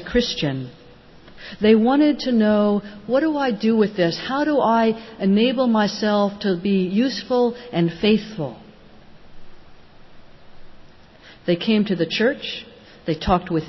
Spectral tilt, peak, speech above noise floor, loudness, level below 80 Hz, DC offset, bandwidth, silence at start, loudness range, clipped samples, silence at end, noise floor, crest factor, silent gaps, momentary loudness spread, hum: -6.5 dB/octave; -4 dBFS; 27 dB; -20 LUFS; -46 dBFS; under 0.1%; 6.2 kHz; 0 s; 8 LU; under 0.1%; 0 s; -46 dBFS; 16 dB; none; 13 LU; none